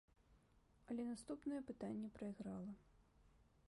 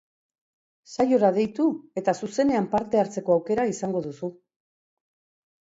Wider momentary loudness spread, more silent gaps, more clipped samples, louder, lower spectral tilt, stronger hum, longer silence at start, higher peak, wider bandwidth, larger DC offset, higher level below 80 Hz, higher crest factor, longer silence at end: second, 5 LU vs 11 LU; neither; neither; second, -50 LUFS vs -24 LUFS; about the same, -7 dB/octave vs -6.5 dB/octave; neither; second, 0.3 s vs 0.9 s; second, -36 dBFS vs -8 dBFS; first, 11.5 kHz vs 8 kHz; neither; second, -74 dBFS vs -62 dBFS; about the same, 16 dB vs 18 dB; second, 0.25 s vs 1.45 s